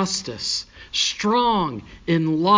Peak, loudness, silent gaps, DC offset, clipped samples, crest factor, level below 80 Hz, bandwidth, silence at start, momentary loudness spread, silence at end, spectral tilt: -4 dBFS; -22 LUFS; none; under 0.1%; under 0.1%; 18 dB; -50 dBFS; 7.6 kHz; 0 s; 8 LU; 0 s; -4 dB/octave